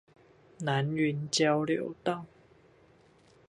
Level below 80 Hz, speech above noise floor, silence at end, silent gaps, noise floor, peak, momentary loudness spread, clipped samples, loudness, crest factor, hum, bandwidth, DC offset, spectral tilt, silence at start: -70 dBFS; 32 dB; 1.2 s; none; -61 dBFS; -14 dBFS; 11 LU; under 0.1%; -30 LUFS; 20 dB; none; 11 kHz; under 0.1%; -5 dB/octave; 0.6 s